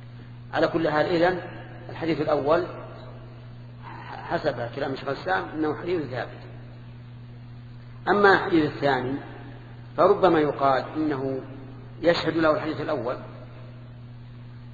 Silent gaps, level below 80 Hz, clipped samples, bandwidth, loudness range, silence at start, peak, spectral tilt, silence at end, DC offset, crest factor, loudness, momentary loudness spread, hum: none; -52 dBFS; under 0.1%; 7.4 kHz; 7 LU; 0 s; -4 dBFS; -7.5 dB/octave; 0 s; under 0.1%; 22 dB; -24 LUFS; 22 LU; none